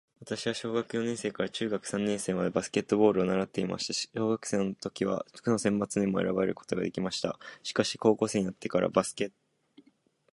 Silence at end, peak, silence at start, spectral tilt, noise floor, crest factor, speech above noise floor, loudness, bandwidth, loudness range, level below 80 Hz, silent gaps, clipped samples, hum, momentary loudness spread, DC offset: 1.05 s; -8 dBFS; 0.2 s; -5 dB/octave; -67 dBFS; 22 dB; 38 dB; -30 LUFS; 11.5 kHz; 1 LU; -64 dBFS; none; under 0.1%; none; 7 LU; under 0.1%